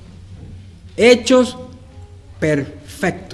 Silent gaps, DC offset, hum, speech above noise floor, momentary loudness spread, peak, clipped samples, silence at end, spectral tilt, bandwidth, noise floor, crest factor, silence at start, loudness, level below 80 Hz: none; under 0.1%; none; 23 dB; 25 LU; 0 dBFS; under 0.1%; 0 s; -4.5 dB/octave; 12 kHz; -39 dBFS; 18 dB; 0.2 s; -16 LUFS; -46 dBFS